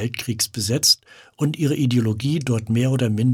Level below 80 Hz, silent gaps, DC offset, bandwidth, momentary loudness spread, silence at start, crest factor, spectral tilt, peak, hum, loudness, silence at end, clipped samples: -58 dBFS; none; under 0.1%; 17.5 kHz; 7 LU; 0 s; 16 dB; -4.5 dB/octave; -4 dBFS; none; -20 LUFS; 0 s; under 0.1%